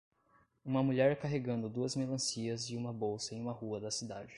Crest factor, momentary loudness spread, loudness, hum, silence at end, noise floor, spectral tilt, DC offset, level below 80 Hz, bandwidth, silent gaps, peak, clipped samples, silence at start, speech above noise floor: 20 dB; 9 LU; -36 LUFS; none; 0 s; -71 dBFS; -5 dB/octave; under 0.1%; -68 dBFS; 11.5 kHz; none; -18 dBFS; under 0.1%; 0.65 s; 35 dB